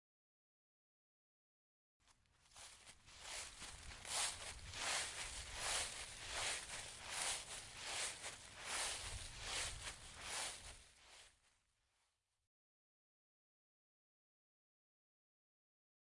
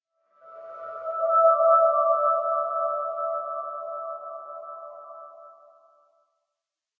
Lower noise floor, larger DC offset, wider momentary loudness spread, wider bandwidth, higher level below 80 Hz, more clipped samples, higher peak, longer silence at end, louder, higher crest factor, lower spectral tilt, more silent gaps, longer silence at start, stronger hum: about the same, -86 dBFS vs -87 dBFS; neither; second, 17 LU vs 24 LU; first, 11.5 kHz vs 2 kHz; first, -66 dBFS vs -88 dBFS; neither; second, -28 dBFS vs -8 dBFS; first, 4.75 s vs 1.45 s; second, -45 LUFS vs -23 LUFS; about the same, 22 dB vs 18 dB; second, 0 dB/octave vs -6.5 dB/octave; neither; first, 2.05 s vs 0.45 s; neither